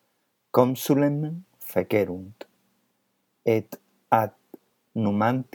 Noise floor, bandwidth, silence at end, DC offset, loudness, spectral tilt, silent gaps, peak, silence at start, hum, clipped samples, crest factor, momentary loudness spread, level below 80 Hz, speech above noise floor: -73 dBFS; 20 kHz; 0.1 s; under 0.1%; -25 LUFS; -7 dB/octave; none; -4 dBFS; 0.55 s; none; under 0.1%; 24 dB; 15 LU; -74 dBFS; 49 dB